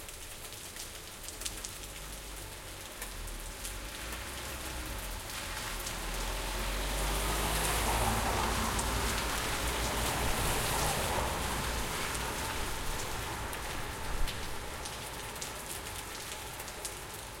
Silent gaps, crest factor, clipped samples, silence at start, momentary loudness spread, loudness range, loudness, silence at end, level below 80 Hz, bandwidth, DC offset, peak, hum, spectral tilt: none; 20 dB; under 0.1%; 0 s; 12 LU; 9 LU; -35 LUFS; 0 s; -42 dBFS; 17 kHz; under 0.1%; -16 dBFS; none; -2.5 dB/octave